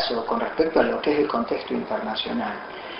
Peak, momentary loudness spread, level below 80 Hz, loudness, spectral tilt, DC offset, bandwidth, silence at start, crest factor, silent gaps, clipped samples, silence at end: -4 dBFS; 7 LU; -56 dBFS; -24 LUFS; -7.5 dB/octave; under 0.1%; 5.8 kHz; 0 s; 20 dB; none; under 0.1%; 0 s